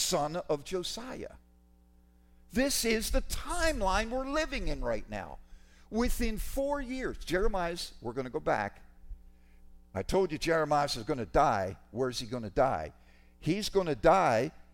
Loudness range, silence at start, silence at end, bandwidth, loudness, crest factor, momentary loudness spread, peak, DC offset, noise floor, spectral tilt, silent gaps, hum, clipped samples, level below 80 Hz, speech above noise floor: 4 LU; 0 s; 0.1 s; 16.5 kHz; -32 LUFS; 22 dB; 11 LU; -10 dBFS; under 0.1%; -62 dBFS; -4 dB/octave; none; none; under 0.1%; -42 dBFS; 31 dB